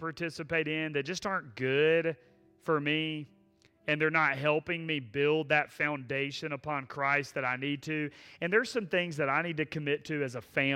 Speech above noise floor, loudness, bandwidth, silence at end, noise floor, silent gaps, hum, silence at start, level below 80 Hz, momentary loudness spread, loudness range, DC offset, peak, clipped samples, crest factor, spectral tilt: 34 dB; -31 LUFS; 14.5 kHz; 0 s; -65 dBFS; none; none; 0 s; -70 dBFS; 9 LU; 2 LU; under 0.1%; -12 dBFS; under 0.1%; 18 dB; -5.5 dB/octave